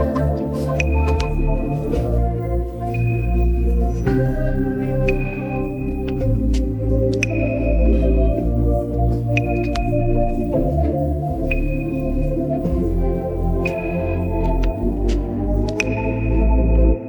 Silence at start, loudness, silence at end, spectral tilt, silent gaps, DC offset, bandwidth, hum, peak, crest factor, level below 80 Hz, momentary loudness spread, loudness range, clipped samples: 0 s; -20 LUFS; 0 s; -8 dB/octave; none; under 0.1%; 19.5 kHz; none; -2 dBFS; 16 dB; -22 dBFS; 4 LU; 2 LU; under 0.1%